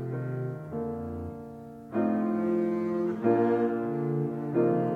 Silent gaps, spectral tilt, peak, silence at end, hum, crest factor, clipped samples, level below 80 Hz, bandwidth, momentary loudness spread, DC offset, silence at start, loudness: none; -10.5 dB/octave; -12 dBFS; 0 s; none; 16 dB; under 0.1%; -64 dBFS; 4.6 kHz; 12 LU; under 0.1%; 0 s; -29 LUFS